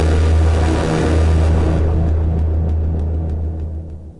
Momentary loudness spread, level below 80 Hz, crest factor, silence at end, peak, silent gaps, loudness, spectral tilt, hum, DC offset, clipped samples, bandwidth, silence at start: 9 LU; -22 dBFS; 10 dB; 0.05 s; -4 dBFS; none; -17 LUFS; -7.5 dB/octave; none; under 0.1%; under 0.1%; 10.5 kHz; 0 s